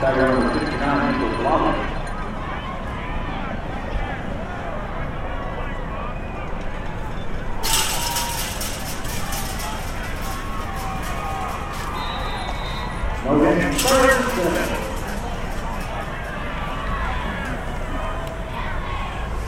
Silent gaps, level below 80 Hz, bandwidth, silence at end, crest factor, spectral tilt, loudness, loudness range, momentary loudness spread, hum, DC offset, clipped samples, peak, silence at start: none; -30 dBFS; 16.5 kHz; 0 s; 20 dB; -4 dB/octave; -24 LUFS; 8 LU; 11 LU; none; under 0.1%; under 0.1%; -4 dBFS; 0 s